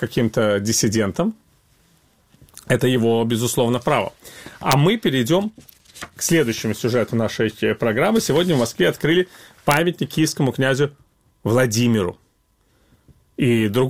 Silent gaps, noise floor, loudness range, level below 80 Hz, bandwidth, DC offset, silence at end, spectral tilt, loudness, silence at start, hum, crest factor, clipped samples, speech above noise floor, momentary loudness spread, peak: none; -62 dBFS; 3 LU; -52 dBFS; 19 kHz; under 0.1%; 0 s; -5 dB/octave; -19 LUFS; 0 s; none; 20 dB; under 0.1%; 43 dB; 9 LU; 0 dBFS